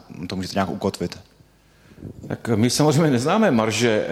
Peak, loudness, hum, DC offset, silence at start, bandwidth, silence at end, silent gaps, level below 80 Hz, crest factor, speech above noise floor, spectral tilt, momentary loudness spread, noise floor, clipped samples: -6 dBFS; -21 LUFS; none; under 0.1%; 0.1 s; 16 kHz; 0 s; none; -54 dBFS; 16 dB; 34 dB; -5 dB/octave; 20 LU; -54 dBFS; under 0.1%